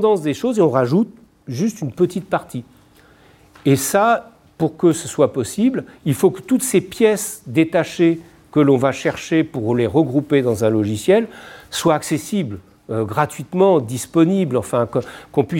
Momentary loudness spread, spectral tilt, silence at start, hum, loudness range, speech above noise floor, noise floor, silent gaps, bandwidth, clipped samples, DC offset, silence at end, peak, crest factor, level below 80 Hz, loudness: 8 LU; -6 dB/octave; 0 s; none; 3 LU; 32 dB; -50 dBFS; none; 17 kHz; under 0.1%; under 0.1%; 0 s; -2 dBFS; 16 dB; -56 dBFS; -18 LUFS